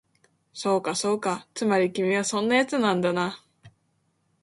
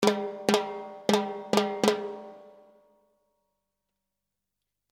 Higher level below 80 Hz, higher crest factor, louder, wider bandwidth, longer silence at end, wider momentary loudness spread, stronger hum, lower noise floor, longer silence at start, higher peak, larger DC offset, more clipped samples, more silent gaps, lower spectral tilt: about the same, -70 dBFS vs -74 dBFS; second, 18 dB vs 26 dB; first, -25 LUFS vs -28 LUFS; second, 11.5 kHz vs 16.5 kHz; second, 0.75 s vs 2.4 s; second, 9 LU vs 12 LU; second, none vs 50 Hz at -80 dBFS; second, -71 dBFS vs -86 dBFS; first, 0.55 s vs 0 s; about the same, -8 dBFS vs -6 dBFS; neither; neither; neither; about the same, -4 dB/octave vs -4 dB/octave